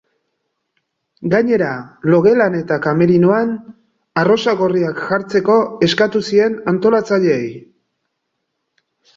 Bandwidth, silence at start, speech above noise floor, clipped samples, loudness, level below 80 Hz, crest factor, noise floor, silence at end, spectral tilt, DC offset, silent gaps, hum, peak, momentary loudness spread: 7.6 kHz; 1.2 s; 59 dB; under 0.1%; -15 LUFS; -56 dBFS; 14 dB; -73 dBFS; 1.6 s; -6.5 dB/octave; under 0.1%; none; none; -2 dBFS; 9 LU